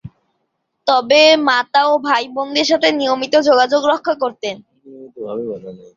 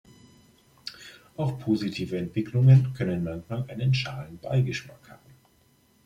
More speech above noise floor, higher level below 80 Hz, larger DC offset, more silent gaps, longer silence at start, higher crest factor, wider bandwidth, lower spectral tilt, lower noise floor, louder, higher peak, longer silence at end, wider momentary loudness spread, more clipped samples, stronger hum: first, 56 dB vs 38 dB; about the same, -60 dBFS vs -58 dBFS; neither; neither; second, 0.05 s vs 0.85 s; about the same, 16 dB vs 18 dB; about the same, 7.6 kHz vs 7.4 kHz; second, -3 dB/octave vs -7.5 dB/octave; first, -71 dBFS vs -63 dBFS; first, -14 LUFS vs -26 LUFS; first, 0 dBFS vs -8 dBFS; second, 0.2 s vs 0.9 s; second, 17 LU vs 21 LU; neither; neither